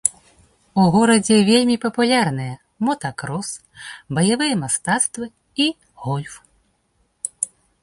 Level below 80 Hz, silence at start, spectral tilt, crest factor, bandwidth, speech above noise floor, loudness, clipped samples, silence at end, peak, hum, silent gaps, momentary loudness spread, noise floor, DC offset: -56 dBFS; 0.05 s; -4 dB/octave; 20 dB; 11.5 kHz; 47 dB; -19 LUFS; under 0.1%; 0.35 s; 0 dBFS; none; none; 17 LU; -65 dBFS; under 0.1%